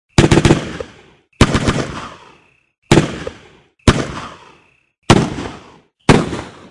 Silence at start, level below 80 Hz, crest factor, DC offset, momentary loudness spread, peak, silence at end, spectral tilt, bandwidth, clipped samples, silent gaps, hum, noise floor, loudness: 0.2 s; -30 dBFS; 16 dB; under 0.1%; 18 LU; 0 dBFS; 0.2 s; -5.5 dB/octave; 12 kHz; under 0.1%; 2.78-2.82 s; none; -50 dBFS; -15 LUFS